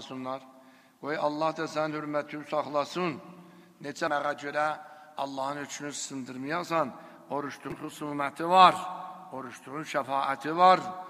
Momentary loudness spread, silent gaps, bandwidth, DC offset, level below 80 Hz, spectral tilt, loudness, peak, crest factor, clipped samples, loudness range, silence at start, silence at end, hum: 19 LU; none; 15 kHz; under 0.1%; -74 dBFS; -4 dB/octave; -29 LUFS; -4 dBFS; 26 dB; under 0.1%; 7 LU; 0 s; 0 s; none